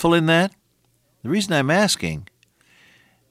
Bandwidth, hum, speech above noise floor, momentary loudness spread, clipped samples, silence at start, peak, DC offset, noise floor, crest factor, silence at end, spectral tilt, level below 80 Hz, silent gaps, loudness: 16 kHz; none; 46 dB; 14 LU; under 0.1%; 0 s; -6 dBFS; under 0.1%; -64 dBFS; 16 dB; 1.05 s; -4.5 dB/octave; -54 dBFS; none; -20 LUFS